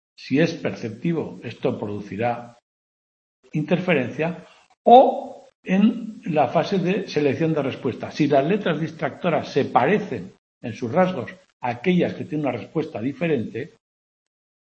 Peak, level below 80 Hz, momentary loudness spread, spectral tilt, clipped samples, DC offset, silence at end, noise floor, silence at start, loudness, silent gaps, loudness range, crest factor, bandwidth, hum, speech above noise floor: 0 dBFS; -66 dBFS; 13 LU; -7.5 dB/octave; under 0.1%; under 0.1%; 1 s; under -90 dBFS; 0.2 s; -22 LUFS; 2.62-3.43 s, 4.77-4.85 s, 5.55-5.63 s, 10.38-10.61 s, 11.53-11.60 s; 7 LU; 22 dB; 7.8 kHz; none; over 68 dB